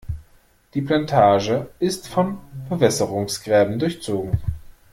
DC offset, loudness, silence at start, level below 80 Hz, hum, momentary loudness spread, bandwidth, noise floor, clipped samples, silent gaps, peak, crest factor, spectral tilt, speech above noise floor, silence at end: under 0.1%; -21 LUFS; 0.1 s; -42 dBFS; none; 15 LU; 16.5 kHz; -55 dBFS; under 0.1%; none; -2 dBFS; 18 dB; -5.5 dB/octave; 35 dB; 0.2 s